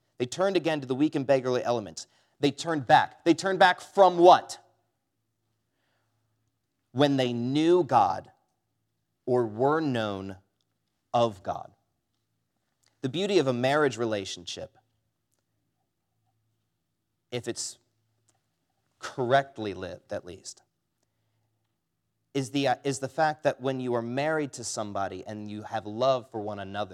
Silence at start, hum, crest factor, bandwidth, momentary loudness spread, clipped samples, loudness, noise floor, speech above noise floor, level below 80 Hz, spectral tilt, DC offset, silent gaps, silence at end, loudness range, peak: 0.2 s; none; 22 dB; 13 kHz; 17 LU; under 0.1%; -26 LUFS; -80 dBFS; 54 dB; -78 dBFS; -5 dB/octave; under 0.1%; none; 0 s; 16 LU; -6 dBFS